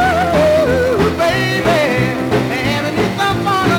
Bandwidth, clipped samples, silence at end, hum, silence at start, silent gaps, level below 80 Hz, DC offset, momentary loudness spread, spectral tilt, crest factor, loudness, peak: 19.5 kHz; under 0.1%; 0 s; none; 0 s; none; -36 dBFS; under 0.1%; 4 LU; -5.5 dB/octave; 12 dB; -14 LUFS; -2 dBFS